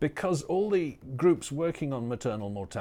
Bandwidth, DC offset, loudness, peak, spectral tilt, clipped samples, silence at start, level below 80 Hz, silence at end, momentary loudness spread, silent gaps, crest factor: 15 kHz; under 0.1%; -30 LUFS; -12 dBFS; -6.5 dB/octave; under 0.1%; 0 s; -58 dBFS; 0 s; 9 LU; none; 16 dB